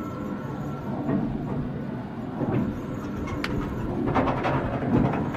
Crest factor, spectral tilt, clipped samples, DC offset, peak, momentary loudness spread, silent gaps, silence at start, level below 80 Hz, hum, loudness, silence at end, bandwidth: 16 dB; -8.5 dB/octave; under 0.1%; under 0.1%; -10 dBFS; 9 LU; none; 0 s; -42 dBFS; none; -28 LUFS; 0 s; 14.5 kHz